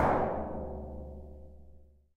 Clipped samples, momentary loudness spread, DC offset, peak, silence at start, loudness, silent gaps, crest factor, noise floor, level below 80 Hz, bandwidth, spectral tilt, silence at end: under 0.1%; 23 LU; under 0.1%; -14 dBFS; 0 s; -36 LUFS; none; 20 dB; -56 dBFS; -46 dBFS; 9.6 kHz; -8.5 dB/octave; 0.3 s